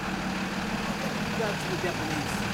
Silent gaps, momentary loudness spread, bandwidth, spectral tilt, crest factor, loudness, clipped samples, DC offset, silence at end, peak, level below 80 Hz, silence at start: none; 2 LU; 16 kHz; -4.5 dB/octave; 14 dB; -30 LUFS; under 0.1%; under 0.1%; 0 s; -16 dBFS; -48 dBFS; 0 s